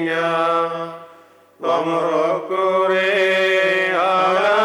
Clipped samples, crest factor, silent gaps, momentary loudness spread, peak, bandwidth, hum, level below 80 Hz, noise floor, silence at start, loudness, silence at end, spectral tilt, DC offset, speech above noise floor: under 0.1%; 12 dB; none; 9 LU; -6 dBFS; 13.5 kHz; none; -78 dBFS; -48 dBFS; 0 s; -18 LUFS; 0 s; -4.5 dB/octave; under 0.1%; 30 dB